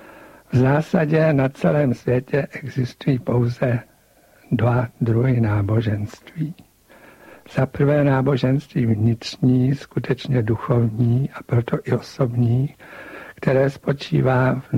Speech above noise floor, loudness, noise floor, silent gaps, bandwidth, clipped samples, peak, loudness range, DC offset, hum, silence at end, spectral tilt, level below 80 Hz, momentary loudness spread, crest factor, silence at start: 35 dB; -20 LUFS; -54 dBFS; none; 8 kHz; under 0.1%; -6 dBFS; 3 LU; under 0.1%; none; 0 s; -8.5 dB/octave; -48 dBFS; 9 LU; 14 dB; 0.15 s